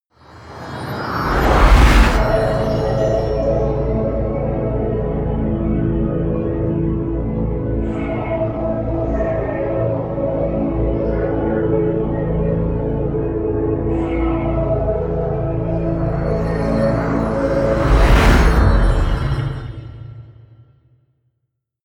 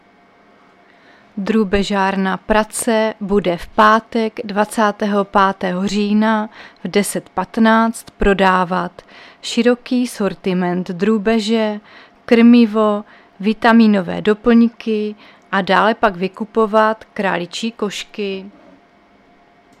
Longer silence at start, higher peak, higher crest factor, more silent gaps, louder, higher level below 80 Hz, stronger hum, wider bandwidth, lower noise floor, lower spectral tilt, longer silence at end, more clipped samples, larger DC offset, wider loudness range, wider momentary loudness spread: second, 0.3 s vs 1.35 s; about the same, 0 dBFS vs 0 dBFS; about the same, 16 dB vs 16 dB; neither; about the same, -18 LUFS vs -16 LUFS; first, -22 dBFS vs -40 dBFS; neither; about the same, 13.5 kHz vs 13.5 kHz; first, -73 dBFS vs -50 dBFS; first, -7.5 dB/octave vs -5.5 dB/octave; first, 1.55 s vs 1.3 s; neither; neither; about the same, 5 LU vs 4 LU; second, 8 LU vs 11 LU